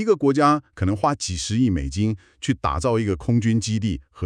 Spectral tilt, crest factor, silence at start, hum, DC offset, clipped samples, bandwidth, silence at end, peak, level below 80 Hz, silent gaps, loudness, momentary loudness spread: -6 dB/octave; 18 dB; 0 s; none; under 0.1%; under 0.1%; 10.5 kHz; 0 s; -4 dBFS; -40 dBFS; none; -22 LUFS; 7 LU